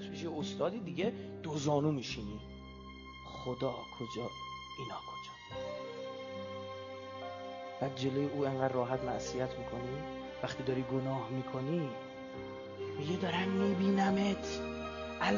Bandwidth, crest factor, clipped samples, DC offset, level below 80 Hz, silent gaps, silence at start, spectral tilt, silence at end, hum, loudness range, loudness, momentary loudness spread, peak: 7.2 kHz; 20 dB; under 0.1%; under 0.1%; -60 dBFS; none; 0 s; -5 dB/octave; 0 s; none; 8 LU; -37 LUFS; 13 LU; -16 dBFS